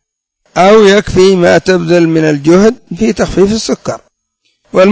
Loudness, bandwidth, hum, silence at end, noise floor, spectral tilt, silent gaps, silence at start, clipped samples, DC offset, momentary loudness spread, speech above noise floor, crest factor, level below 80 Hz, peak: -9 LUFS; 8 kHz; none; 0 s; -61 dBFS; -5.5 dB/octave; none; 0.55 s; 1%; under 0.1%; 11 LU; 53 dB; 8 dB; -34 dBFS; 0 dBFS